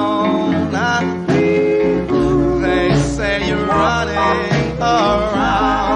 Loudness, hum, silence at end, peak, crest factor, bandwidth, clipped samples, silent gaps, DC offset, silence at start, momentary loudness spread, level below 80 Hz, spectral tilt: -16 LUFS; none; 0 s; -2 dBFS; 14 dB; 10 kHz; under 0.1%; none; under 0.1%; 0 s; 3 LU; -32 dBFS; -6 dB/octave